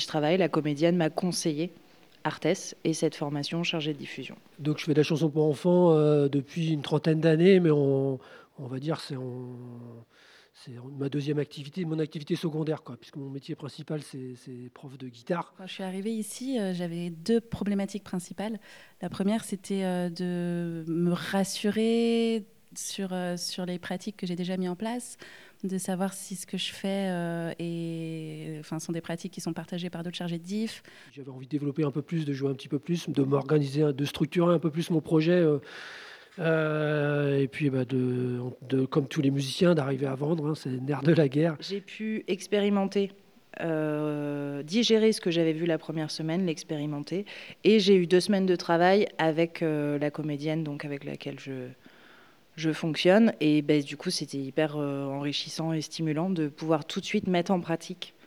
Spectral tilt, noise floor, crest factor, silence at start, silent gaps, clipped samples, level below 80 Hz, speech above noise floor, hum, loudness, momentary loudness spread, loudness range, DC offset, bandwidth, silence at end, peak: -6 dB/octave; -57 dBFS; 20 dB; 0 s; none; under 0.1%; -70 dBFS; 29 dB; none; -28 LUFS; 15 LU; 10 LU; under 0.1%; 15 kHz; 0.15 s; -8 dBFS